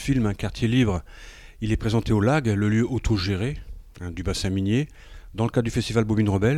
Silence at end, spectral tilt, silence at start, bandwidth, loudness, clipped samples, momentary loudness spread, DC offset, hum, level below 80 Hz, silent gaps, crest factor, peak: 0 s; -6.5 dB/octave; 0 s; 13 kHz; -24 LUFS; under 0.1%; 13 LU; under 0.1%; none; -38 dBFS; none; 16 dB; -8 dBFS